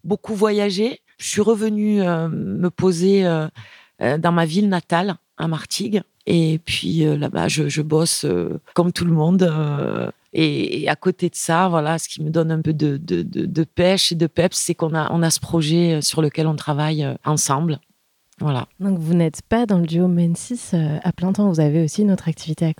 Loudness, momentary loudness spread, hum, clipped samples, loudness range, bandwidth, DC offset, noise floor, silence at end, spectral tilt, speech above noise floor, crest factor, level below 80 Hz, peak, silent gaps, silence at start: -20 LUFS; 6 LU; none; under 0.1%; 2 LU; 16.5 kHz; under 0.1%; -62 dBFS; 0.05 s; -5.5 dB/octave; 43 dB; 18 dB; -52 dBFS; -2 dBFS; none; 0.05 s